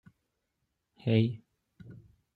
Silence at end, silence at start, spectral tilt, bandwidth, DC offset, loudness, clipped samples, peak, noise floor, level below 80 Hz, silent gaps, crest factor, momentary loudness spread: 0.4 s; 1.05 s; -10 dB/octave; 4.7 kHz; under 0.1%; -30 LUFS; under 0.1%; -12 dBFS; -82 dBFS; -70 dBFS; none; 24 dB; 25 LU